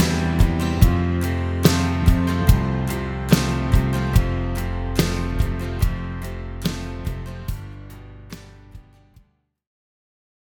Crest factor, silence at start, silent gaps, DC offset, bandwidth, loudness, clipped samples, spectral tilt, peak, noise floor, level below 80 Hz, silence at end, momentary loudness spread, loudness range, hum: 20 dB; 0 s; none; under 0.1%; over 20 kHz; -22 LUFS; under 0.1%; -6 dB/octave; 0 dBFS; -60 dBFS; -26 dBFS; 1.7 s; 16 LU; 16 LU; none